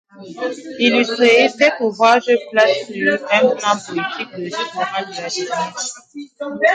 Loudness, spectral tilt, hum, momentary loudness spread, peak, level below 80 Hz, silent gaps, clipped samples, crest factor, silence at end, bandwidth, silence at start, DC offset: -17 LUFS; -3 dB/octave; none; 14 LU; 0 dBFS; -70 dBFS; none; under 0.1%; 16 dB; 0 s; 9.4 kHz; 0.15 s; under 0.1%